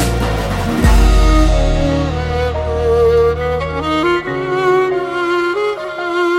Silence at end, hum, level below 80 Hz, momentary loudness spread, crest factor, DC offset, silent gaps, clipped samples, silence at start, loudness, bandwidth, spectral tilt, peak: 0 s; none; -18 dBFS; 6 LU; 14 dB; under 0.1%; none; under 0.1%; 0 s; -15 LUFS; 15.5 kHz; -6 dB/octave; 0 dBFS